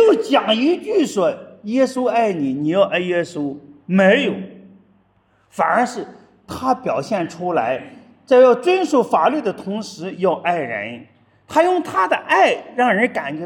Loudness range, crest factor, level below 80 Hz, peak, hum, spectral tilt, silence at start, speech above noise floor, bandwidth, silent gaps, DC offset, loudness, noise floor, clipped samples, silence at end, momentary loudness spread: 5 LU; 18 dB; -66 dBFS; -2 dBFS; none; -5.5 dB/octave; 0 s; 42 dB; 12.5 kHz; none; under 0.1%; -18 LUFS; -59 dBFS; under 0.1%; 0 s; 13 LU